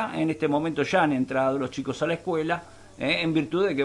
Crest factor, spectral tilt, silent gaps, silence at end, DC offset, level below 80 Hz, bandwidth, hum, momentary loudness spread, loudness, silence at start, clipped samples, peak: 16 dB; -6 dB/octave; none; 0 s; under 0.1%; -60 dBFS; 11.5 kHz; none; 7 LU; -26 LUFS; 0 s; under 0.1%; -8 dBFS